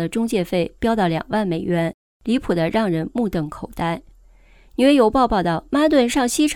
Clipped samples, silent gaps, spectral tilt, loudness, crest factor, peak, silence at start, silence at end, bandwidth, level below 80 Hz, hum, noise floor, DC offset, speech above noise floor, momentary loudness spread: under 0.1%; 1.94-2.20 s; -5.5 dB/octave; -20 LUFS; 16 dB; -4 dBFS; 0 s; 0 s; 17 kHz; -42 dBFS; none; -49 dBFS; under 0.1%; 30 dB; 10 LU